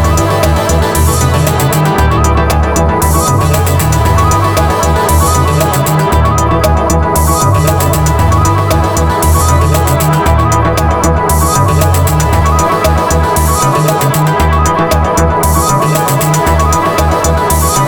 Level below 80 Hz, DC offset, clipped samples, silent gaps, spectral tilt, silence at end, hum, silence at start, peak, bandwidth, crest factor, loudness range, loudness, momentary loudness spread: -18 dBFS; 0.2%; under 0.1%; none; -5 dB/octave; 0 s; none; 0 s; 0 dBFS; over 20 kHz; 8 dB; 0 LU; -10 LUFS; 1 LU